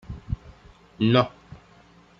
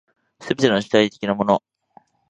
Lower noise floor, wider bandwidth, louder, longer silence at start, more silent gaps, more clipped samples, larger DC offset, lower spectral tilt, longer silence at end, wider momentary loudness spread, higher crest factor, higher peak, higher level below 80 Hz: about the same, -54 dBFS vs -54 dBFS; second, 6.8 kHz vs 9.2 kHz; second, -25 LUFS vs -20 LUFS; second, 0.1 s vs 0.4 s; neither; neither; neither; first, -8 dB/octave vs -5.5 dB/octave; about the same, 0.65 s vs 0.7 s; first, 15 LU vs 8 LU; about the same, 22 dB vs 20 dB; second, -6 dBFS vs 0 dBFS; first, -44 dBFS vs -60 dBFS